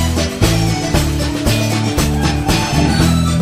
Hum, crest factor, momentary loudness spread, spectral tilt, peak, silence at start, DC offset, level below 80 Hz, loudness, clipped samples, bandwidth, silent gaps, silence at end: none; 14 dB; 3 LU; -5 dB/octave; 0 dBFS; 0 s; under 0.1%; -22 dBFS; -15 LUFS; under 0.1%; 16 kHz; none; 0 s